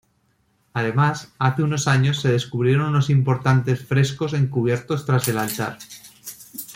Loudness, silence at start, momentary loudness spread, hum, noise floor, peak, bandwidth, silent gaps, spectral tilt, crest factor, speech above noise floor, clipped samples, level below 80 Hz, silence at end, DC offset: -21 LUFS; 0.75 s; 16 LU; none; -65 dBFS; -4 dBFS; 16.5 kHz; none; -6 dB/octave; 16 dB; 45 dB; under 0.1%; -56 dBFS; 0 s; under 0.1%